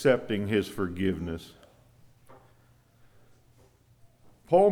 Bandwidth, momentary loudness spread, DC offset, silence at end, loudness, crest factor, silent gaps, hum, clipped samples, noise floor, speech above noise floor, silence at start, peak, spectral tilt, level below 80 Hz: 16 kHz; 14 LU; under 0.1%; 0 s; -29 LUFS; 20 dB; none; none; under 0.1%; -61 dBFS; 33 dB; 0 s; -10 dBFS; -6.5 dB/octave; -58 dBFS